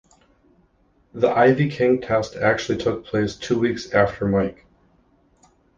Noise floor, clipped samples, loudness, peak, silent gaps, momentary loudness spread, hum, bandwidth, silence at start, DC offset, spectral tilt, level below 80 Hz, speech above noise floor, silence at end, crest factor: -61 dBFS; under 0.1%; -21 LUFS; -4 dBFS; none; 7 LU; none; 7.6 kHz; 1.15 s; under 0.1%; -6.5 dB/octave; -48 dBFS; 41 dB; 1.25 s; 18 dB